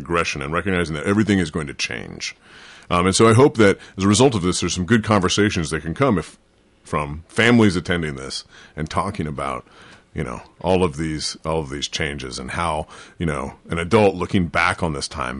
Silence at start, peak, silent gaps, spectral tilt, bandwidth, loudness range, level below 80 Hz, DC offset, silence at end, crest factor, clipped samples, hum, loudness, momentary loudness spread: 0 s; -4 dBFS; none; -5 dB/octave; 11.5 kHz; 8 LU; -40 dBFS; under 0.1%; 0 s; 16 dB; under 0.1%; none; -20 LUFS; 14 LU